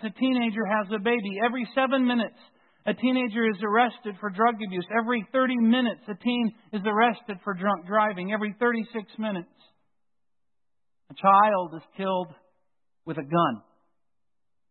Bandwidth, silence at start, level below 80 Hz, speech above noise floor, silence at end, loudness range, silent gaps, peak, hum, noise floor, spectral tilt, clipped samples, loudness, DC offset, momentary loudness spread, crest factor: 4.4 kHz; 0 s; -78 dBFS; 64 dB; 1.1 s; 4 LU; none; -8 dBFS; none; -89 dBFS; -10 dB/octave; under 0.1%; -26 LUFS; under 0.1%; 11 LU; 20 dB